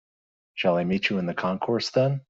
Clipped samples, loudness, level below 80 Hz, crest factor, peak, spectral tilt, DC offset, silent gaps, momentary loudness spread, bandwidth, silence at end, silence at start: under 0.1%; -25 LUFS; -62 dBFS; 16 dB; -10 dBFS; -6 dB/octave; under 0.1%; none; 4 LU; 7.8 kHz; 0.1 s; 0.55 s